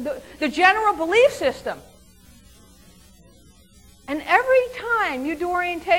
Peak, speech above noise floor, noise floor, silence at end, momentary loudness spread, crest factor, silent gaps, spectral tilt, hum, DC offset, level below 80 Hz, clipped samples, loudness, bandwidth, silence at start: -2 dBFS; 31 dB; -51 dBFS; 0 s; 14 LU; 20 dB; none; -3.5 dB/octave; none; under 0.1%; -52 dBFS; under 0.1%; -20 LUFS; 17 kHz; 0 s